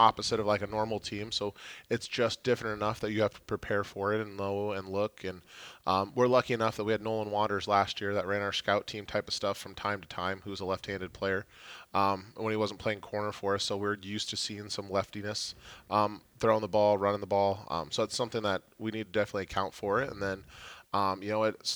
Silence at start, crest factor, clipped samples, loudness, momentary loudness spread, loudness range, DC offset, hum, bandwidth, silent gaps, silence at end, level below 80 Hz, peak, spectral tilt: 0 s; 22 dB; under 0.1%; -32 LUFS; 8 LU; 4 LU; under 0.1%; none; over 20 kHz; none; 0 s; -62 dBFS; -8 dBFS; -4.5 dB/octave